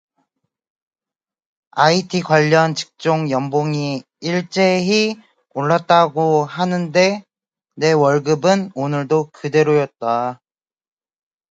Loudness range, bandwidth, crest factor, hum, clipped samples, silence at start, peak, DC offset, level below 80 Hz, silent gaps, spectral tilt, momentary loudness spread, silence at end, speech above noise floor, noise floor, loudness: 2 LU; 9 kHz; 18 dB; none; under 0.1%; 1.75 s; 0 dBFS; under 0.1%; -64 dBFS; none; -5.5 dB/octave; 8 LU; 1.15 s; over 73 dB; under -90 dBFS; -17 LUFS